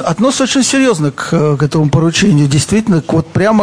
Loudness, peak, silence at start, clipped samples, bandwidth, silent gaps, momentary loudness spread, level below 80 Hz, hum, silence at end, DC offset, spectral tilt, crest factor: -11 LUFS; 0 dBFS; 0 s; under 0.1%; 10.5 kHz; none; 4 LU; -38 dBFS; none; 0 s; 0.4%; -5 dB/octave; 10 dB